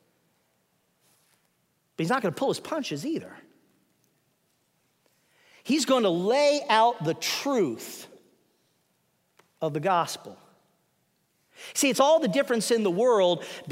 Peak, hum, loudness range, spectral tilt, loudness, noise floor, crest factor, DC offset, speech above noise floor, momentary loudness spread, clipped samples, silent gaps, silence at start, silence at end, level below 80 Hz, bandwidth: -8 dBFS; none; 8 LU; -4 dB/octave; -25 LUFS; -72 dBFS; 20 dB; under 0.1%; 47 dB; 15 LU; under 0.1%; none; 2 s; 0 s; -82 dBFS; 16 kHz